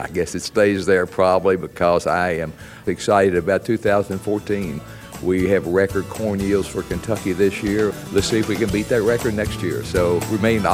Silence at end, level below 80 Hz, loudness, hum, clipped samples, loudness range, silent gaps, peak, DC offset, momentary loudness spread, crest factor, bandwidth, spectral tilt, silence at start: 0 s; -42 dBFS; -20 LUFS; none; under 0.1%; 2 LU; none; -2 dBFS; under 0.1%; 8 LU; 18 dB; 16 kHz; -5.5 dB/octave; 0 s